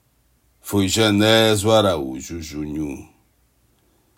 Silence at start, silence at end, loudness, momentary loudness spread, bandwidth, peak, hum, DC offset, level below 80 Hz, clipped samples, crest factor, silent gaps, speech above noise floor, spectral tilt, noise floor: 0.65 s; 1.15 s; -18 LUFS; 16 LU; 16.5 kHz; -2 dBFS; none; under 0.1%; -50 dBFS; under 0.1%; 18 dB; none; 43 dB; -4.5 dB/octave; -62 dBFS